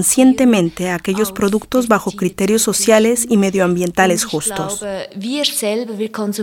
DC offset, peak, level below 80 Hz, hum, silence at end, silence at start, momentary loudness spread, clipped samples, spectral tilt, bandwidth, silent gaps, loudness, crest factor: under 0.1%; 0 dBFS; -48 dBFS; none; 0 s; 0 s; 10 LU; under 0.1%; -4 dB/octave; 18 kHz; none; -16 LUFS; 16 dB